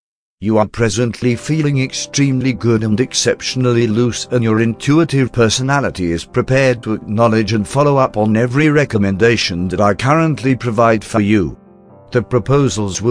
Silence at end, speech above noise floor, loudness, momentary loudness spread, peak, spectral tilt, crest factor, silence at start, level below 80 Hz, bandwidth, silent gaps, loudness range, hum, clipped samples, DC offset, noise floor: 0 s; 28 dB; -15 LUFS; 5 LU; 0 dBFS; -5.5 dB/octave; 14 dB; 0.4 s; -42 dBFS; 10.5 kHz; none; 2 LU; none; under 0.1%; under 0.1%; -42 dBFS